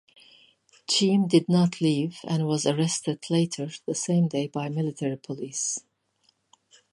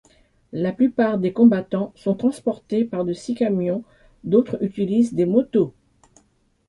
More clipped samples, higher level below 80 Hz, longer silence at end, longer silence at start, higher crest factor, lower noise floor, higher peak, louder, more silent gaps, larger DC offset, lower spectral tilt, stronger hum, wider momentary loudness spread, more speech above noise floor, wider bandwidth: neither; second, -72 dBFS vs -58 dBFS; first, 1.15 s vs 1 s; first, 0.9 s vs 0.55 s; about the same, 20 dB vs 18 dB; first, -69 dBFS vs -62 dBFS; second, -8 dBFS vs -4 dBFS; second, -26 LUFS vs -21 LUFS; neither; neither; second, -5 dB/octave vs -8 dB/octave; neither; about the same, 10 LU vs 10 LU; about the same, 44 dB vs 42 dB; about the same, 11.5 kHz vs 11 kHz